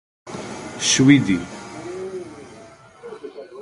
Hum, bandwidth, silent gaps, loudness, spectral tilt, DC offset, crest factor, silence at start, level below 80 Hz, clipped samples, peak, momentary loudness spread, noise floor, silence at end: none; 11.5 kHz; none; -18 LUFS; -4 dB/octave; under 0.1%; 22 dB; 0.25 s; -54 dBFS; under 0.1%; 0 dBFS; 24 LU; -45 dBFS; 0 s